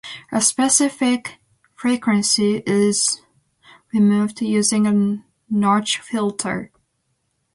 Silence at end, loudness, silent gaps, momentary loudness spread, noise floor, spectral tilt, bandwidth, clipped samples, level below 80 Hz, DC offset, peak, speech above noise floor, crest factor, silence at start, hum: 0.9 s; -19 LUFS; none; 10 LU; -70 dBFS; -3.5 dB/octave; 11.5 kHz; under 0.1%; -62 dBFS; under 0.1%; -2 dBFS; 52 dB; 18 dB; 0.05 s; none